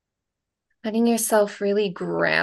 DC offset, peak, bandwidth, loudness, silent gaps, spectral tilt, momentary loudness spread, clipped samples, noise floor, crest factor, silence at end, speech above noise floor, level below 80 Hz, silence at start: under 0.1%; -6 dBFS; 12.5 kHz; -22 LUFS; none; -4 dB/octave; 7 LU; under 0.1%; -83 dBFS; 18 dB; 0 s; 62 dB; -70 dBFS; 0.85 s